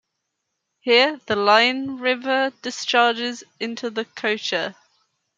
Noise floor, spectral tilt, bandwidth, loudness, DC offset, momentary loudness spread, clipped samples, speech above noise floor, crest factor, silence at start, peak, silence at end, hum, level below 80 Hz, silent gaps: -78 dBFS; -2.5 dB/octave; 9 kHz; -20 LUFS; under 0.1%; 12 LU; under 0.1%; 57 dB; 20 dB; 0.85 s; -2 dBFS; 0.65 s; none; -74 dBFS; none